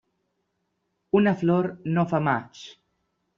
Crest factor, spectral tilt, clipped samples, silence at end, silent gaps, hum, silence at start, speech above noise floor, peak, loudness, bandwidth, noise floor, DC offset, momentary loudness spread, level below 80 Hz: 18 dB; -6.5 dB/octave; under 0.1%; 0.65 s; none; none; 1.15 s; 53 dB; -8 dBFS; -24 LUFS; 7.2 kHz; -76 dBFS; under 0.1%; 21 LU; -64 dBFS